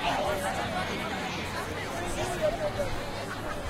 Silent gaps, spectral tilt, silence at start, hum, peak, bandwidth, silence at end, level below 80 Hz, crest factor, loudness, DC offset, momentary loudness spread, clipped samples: none; -4 dB/octave; 0 s; none; -16 dBFS; 16 kHz; 0 s; -44 dBFS; 16 dB; -32 LUFS; under 0.1%; 6 LU; under 0.1%